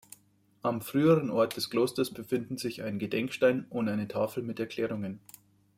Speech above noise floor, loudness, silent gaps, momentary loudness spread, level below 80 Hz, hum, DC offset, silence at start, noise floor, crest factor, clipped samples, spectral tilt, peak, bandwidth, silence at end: 36 dB; -30 LUFS; none; 10 LU; -70 dBFS; none; under 0.1%; 0.65 s; -66 dBFS; 18 dB; under 0.1%; -6 dB/octave; -12 dBFS; 16 kHz; 0.6 s